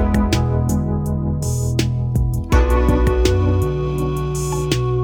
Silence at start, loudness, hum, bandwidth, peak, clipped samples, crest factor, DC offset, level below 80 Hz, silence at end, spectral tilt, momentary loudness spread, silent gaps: 0 s; -19 LUFS; none; 19 kHz; -2 dBFS; under 0.1%; 16 dB; under 0.1%; -22 dBFS; 0 s; -6.5 dB/octave; 5 LU; none